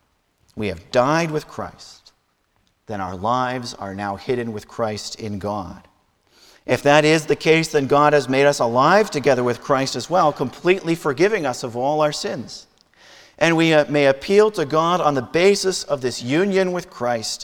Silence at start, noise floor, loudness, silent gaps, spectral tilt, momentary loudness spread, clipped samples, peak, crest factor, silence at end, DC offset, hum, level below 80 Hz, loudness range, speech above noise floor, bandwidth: 0.55 s; -65 dBFS; -19 LUFS; none; -5 dB/octave; 13 LU; under 0.1%; 0 dBFS; 20 dB; 0 s; under 0.1%; none; -54 dBFS; 9 LU; 46 dB; 19 kHz